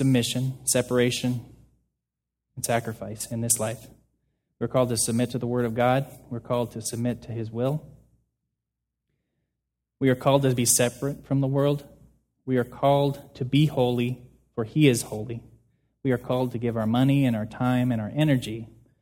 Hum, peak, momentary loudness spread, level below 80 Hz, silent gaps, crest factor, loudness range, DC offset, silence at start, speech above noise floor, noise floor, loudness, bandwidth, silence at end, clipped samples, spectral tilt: none; -6 dBFS; 13 LU; -56 dBFS; none; 20 dB; 6 LU; under 0.1%; 0 s; 61 dB; -85 dBFS; -25 LUFS; 17 kHz; 0.35 s; under 0.1%; -5 dB/octave